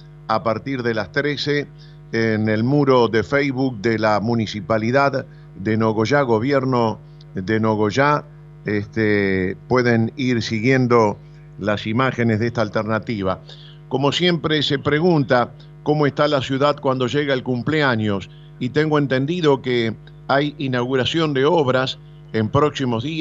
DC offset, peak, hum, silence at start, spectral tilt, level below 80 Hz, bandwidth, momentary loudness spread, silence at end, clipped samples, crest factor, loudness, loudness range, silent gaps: under 0.1%; -2 dBFS; none; 0 s; -6.5 dB/octave; -52 dBFS; 7.8 kHz; 9 LU; 0 s; under 0.1%; 18 dB; -19 LUFS; 2 LU; none